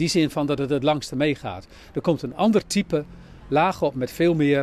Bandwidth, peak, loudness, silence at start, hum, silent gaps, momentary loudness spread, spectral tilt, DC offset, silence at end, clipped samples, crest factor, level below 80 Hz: 14 kHz; -8 dBFS; -23 LUFS; 0 s; none; none; 10 LU; -5.5 dB/octave; under 0.1%; 0 s; under 0.1%; 14 dB; -50 dBFS